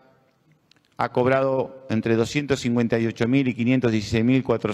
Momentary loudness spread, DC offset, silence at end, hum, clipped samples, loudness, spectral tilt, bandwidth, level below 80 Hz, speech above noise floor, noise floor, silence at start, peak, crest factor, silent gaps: 5 LU; under 0.1%; 0 s; none; under 0.1%; -22 LUFS; -6.5 dB/octave; 11.5 kHz; -54 dBFS; 40 dB; -62 dBFS; 1 s; -8 dBFS; 16 dB; none